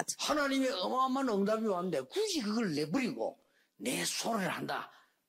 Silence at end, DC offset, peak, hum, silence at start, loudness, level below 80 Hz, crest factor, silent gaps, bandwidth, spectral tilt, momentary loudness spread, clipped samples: 0.4 s; under 0.1%; -16 dBFS; none; 0 s; -33 LUFS; -72 dBFS; 18 dB; none; 16 kHz; -3.5 dB/octave; 8 LU; under 0.1%